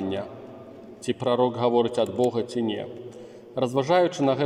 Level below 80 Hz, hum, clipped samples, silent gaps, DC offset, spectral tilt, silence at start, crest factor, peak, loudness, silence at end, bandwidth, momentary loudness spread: -68 dBFS; none; under 0.1%; none; under 0.1%; -6 dB/octave; 0 s; 18 dB; -8 dBFS; -25 LUFS; 0 s; 12 kHz; 20 LU